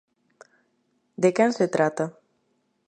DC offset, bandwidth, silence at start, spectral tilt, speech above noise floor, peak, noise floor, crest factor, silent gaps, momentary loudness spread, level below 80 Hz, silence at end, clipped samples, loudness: under 0.1%; 9.6 kHz; 1.2 s; -6 dB/octave; 49 dB; -6 dBFS; -71 dBFS; 20 dB; none; 11 LU; -78 dBFS; 0.75 s; under 0.1%; -23 LUFS